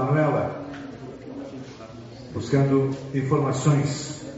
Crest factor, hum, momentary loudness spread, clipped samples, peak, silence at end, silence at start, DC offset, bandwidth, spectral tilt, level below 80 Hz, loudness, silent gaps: 18 dB; none; 18 LU; under 0.1%; -8 dBFS; 0 s; 0 s; under 0.1%; 8 kHz; -7.5 dB/octave; -54 dBFS; -24 LUFS; none